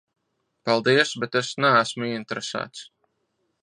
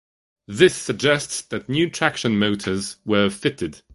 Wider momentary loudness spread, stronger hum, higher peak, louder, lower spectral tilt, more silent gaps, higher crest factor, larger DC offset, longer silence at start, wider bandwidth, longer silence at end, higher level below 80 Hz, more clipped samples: first, 14 LU vs 9 LU; neither; second, -4 dBFS vs 0 dBFS; about the same, -23 LUFS vs -21 LUFS; about the same, -4 dB/octave vs -4.5 dB/octave; neither; about the same, 20 dB vs 20 dB; neither; first, 0.65 s vs 0.5 s; about the same, 10.5 kHz vs 11.5 kHz; first, 0.8 s vs 0.15 s; second, -72 dBFS vs -52 dBFS; neither